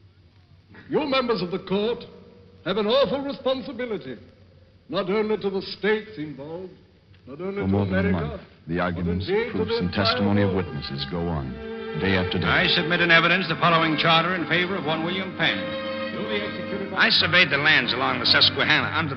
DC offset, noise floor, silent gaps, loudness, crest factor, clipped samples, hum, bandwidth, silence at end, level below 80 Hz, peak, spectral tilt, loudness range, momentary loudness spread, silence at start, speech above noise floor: under 0.1%; -54 dBFS; none; -22 LUFS; 20 dB; under 0.1%; none; 6.2 kHz; 0 s; -50 dBFS; -4 dBFS; -6.5 dB/octave; 8 LU; 15 LU; 0.75 s; 31 dB